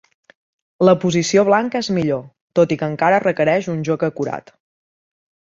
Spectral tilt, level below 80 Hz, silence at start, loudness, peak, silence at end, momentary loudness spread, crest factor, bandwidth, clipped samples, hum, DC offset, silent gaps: -5.5 dB/octave; -58 dBFS; 0.8 s; -18 LUFS; -2 dBFS; 1.1 s; 9 LU; 18 dB; 7.8 kHz; under 0.1%; none; under 0.1%; 2.41-2.48 s